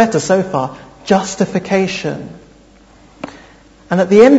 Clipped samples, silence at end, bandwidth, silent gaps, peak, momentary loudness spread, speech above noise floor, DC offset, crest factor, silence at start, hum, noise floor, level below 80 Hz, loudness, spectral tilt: 0.2%; 0 s; 8 kHz; none; 0 dBFS; 20 LU; 32 dB; under 0.1%; 14 dB; 0 s; none; -45 dBFS; -50 dBFS; -15 LUFS; -5.5 dB/octave